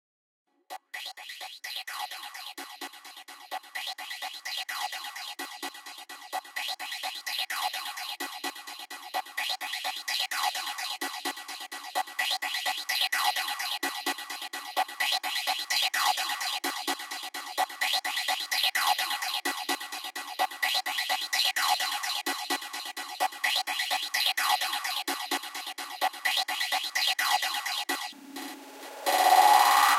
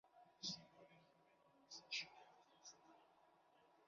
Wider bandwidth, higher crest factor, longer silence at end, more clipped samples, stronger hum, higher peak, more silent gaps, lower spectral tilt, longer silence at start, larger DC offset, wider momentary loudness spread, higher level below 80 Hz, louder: first, 17 kHz vs 7.2 kHz; about the same, 24 dB vs 26 dB; about the same, 0 s vs 0 s; neither; neither; first, -8 dBFS vs -34 dBFS; neither; second, 3 dB/octave vs 0 dB/octave; first, 0.7 s vs 0.05 s; neither; second, 14 LU vs 20 LU; about the same, under -90 dBFS vs under -90 dBFS; first, -29 LUFS vs -52 LUFS